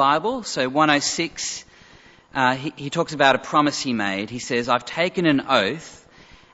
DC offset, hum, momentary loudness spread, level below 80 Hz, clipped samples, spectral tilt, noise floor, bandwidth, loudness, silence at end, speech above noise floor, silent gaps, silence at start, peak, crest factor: under 0.1%; none; 10 LU; -58 dBFS; under 0.1%; -3.5 dB/octave; -50 dBFS; 8 kHz; -21 LUFS; 0.6 s; 29 dB; none; 0 s; -2 dBFS; 22 dB